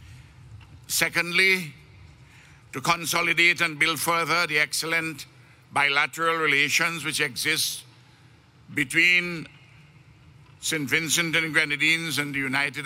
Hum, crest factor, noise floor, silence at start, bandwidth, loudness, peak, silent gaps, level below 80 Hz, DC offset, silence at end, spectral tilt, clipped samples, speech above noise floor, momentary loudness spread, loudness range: none; 20 dB; -54 dBFS; 0 s; 16 kHz; -22 LUFS; -6 dBFS; none; -62 dBFS; under 0.1%; 0 s; -2 dB/octave; under 0.1%; 30 dB; 11 LU; 3 LU